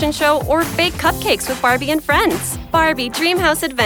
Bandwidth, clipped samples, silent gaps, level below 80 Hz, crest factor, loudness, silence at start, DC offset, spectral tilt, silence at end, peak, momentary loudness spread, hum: over 20 kHz; under 0.1%; none; -36 dBFS; 14 dB; -16 LUFS; 0 s; under 0.1%; -3.5 dB/octave; 0 s; -2 dBFS; 3 LU; none